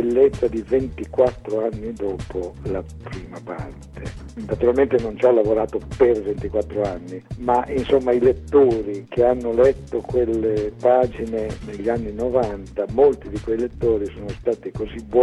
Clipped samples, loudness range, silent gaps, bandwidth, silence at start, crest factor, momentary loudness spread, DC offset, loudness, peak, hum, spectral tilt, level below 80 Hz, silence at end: under 0.1%; 6 LU; none; 11 kHz; 0 s; 18 dB; 15 LU; under 0.1%; -21 LUFS; -4 dBFS; none; -8 dB/octave; -38 dBFS; 0 s